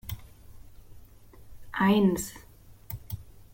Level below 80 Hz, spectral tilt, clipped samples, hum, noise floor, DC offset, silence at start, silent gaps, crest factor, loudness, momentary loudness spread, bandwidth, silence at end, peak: -52 dBFS; -5.5 dB/octave; under 0.1%; none; -50 dBFS; under 0.1%; 0.05 s; none; 18 dB; -27 LUFS; 20 LU; 17 kHz; 0.25 s; -12 dBFS